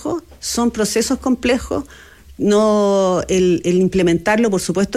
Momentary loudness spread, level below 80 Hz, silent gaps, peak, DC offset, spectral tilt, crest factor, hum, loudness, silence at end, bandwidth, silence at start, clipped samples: 10 LU; -40 dBFS; none; -4 dBFS; under 0.1%; -5 dB/octave; 12 dB; none; -17 LUFS; 0 s; 15 kHz; 0 s; under 0.1%